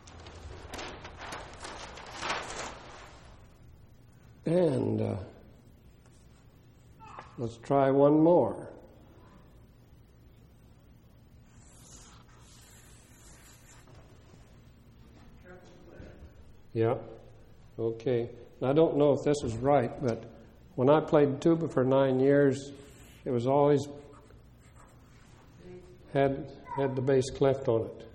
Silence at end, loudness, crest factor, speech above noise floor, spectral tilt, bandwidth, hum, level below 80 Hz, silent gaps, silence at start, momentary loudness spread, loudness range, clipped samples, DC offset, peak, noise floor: 0.05 s; -28 LUFS; 22 dB; 30 dB; -7 dB/octave; 12 kHz; none; -56 dBFS; none; 0.05 s; 25 LU; 12 LU; under 0.1%; under 0.1%; -10 dBFS; -57 dBFS